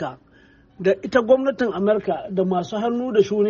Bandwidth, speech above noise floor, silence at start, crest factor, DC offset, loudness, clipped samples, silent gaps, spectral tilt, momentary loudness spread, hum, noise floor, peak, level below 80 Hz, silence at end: 7.2 kHz; 32 dB; 0 s; 16 dB; under 0.1%; -21 LUFS; under 0.1%; none; -5.5 dB/octave; 6 LU; none; -53 dBFS; -4 dBFS; -58 dBFS; 0 s